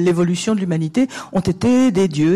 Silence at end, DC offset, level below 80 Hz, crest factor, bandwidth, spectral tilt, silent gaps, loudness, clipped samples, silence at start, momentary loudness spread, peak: 0 s; under 0.1%; -46 dBFS; 10 dB; 12 kHz; -6.5 dB/octave; none; -17 LUFS; under 0.1%; 0 s; 6 LU; -6 dBFS